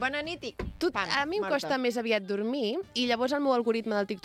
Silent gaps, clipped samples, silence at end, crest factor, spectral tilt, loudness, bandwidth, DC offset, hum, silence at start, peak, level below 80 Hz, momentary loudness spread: none; under 0.1%; 0.05 s; 18 dB; -4.5 dB/octave; -29 LUFS; 15.5 kHz; under 0.1%; none; 0 s; -12 dBFS; -54 dBFS; 6 LU